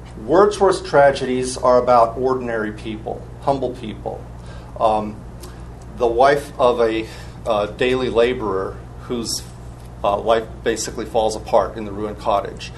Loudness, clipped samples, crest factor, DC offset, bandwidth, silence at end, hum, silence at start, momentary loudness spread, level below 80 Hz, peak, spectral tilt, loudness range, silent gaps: -19 LUFS; under 0.1%; 20 dB; under 0.1%; 12.5 kHz; 0 s; none; 0 s; 20 LU; -38 dBFS; 0 dBFS; -5 dB/octave; 6 LU; none